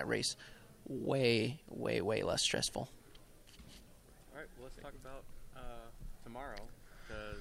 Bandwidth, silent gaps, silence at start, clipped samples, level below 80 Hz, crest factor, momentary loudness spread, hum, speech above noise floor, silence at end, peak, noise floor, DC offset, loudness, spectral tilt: 16 kHz; none; 0 s; under 0.1%; -56 dBFS; 22 dB; 24 LU; none; 21 dB; 0 s; -20 dBFS; -59 dBFS; under 0.1%; -37 LUFS; -3.5 dB/octave